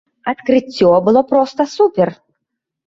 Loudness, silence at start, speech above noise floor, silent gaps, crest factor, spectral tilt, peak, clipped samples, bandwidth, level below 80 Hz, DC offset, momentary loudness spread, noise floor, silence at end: -14 LUFS; 0.25 s; 63 dB; none; 14 dB; -6.5 dB/octave; -2 dBFS; under 0.1%; 7.6 kHz; -54 dBFS; under 0.1%; 7 LU; -77 dBFS; 0.75 s